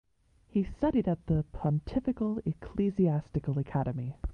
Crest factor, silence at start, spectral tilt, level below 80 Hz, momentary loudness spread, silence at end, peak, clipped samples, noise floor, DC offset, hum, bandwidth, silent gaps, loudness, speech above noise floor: 14 dB; 0.55 s; -10.5 dB/octave; -46 dBFS; 6 LU; 0 s; -16 dBFS; under 0.1%; -64 dBFS; under 0.1%; none; 5.6 kHz; none; -31 LUFS; 34 dB